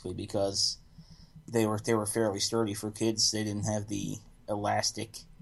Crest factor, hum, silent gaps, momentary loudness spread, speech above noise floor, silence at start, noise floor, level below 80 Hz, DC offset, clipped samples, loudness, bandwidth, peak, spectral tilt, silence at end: 18 dB; none; none; 12 LU; 22 dB; 0 s; -53 dBFS; -58 dBFS; under 0.1%; under 0.1%; -30 LUFS; 13 kHz; -14 dBFS; -3.5 dB/octave; 0.05 s